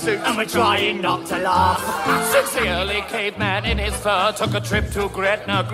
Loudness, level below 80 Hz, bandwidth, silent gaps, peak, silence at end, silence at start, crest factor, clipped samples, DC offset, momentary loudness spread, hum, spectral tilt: -20 LUFS; -34 dBFS; 16 kHz; none; -4 dBFS; 0 s; 0 s; 16 dB; under 0.1%; under 0.1%; 5 LU; none; -4 dB/octave